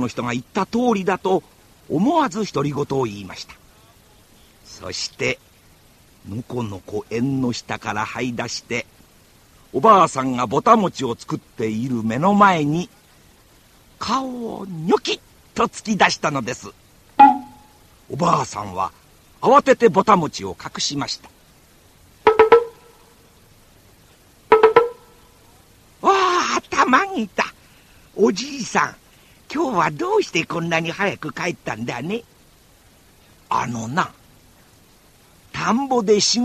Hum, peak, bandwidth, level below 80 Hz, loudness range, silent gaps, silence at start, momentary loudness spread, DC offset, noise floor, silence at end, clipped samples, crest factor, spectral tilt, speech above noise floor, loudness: none; 0 dBFS; 14 kHz; -54 dBFS; 8 LU; none; 0 s; 16 LU; under 0.1%; -52 dBFS; 0 s; under 0.1%; 20 dB; -4.5 dB/octave; 32 dB; -20 LUFS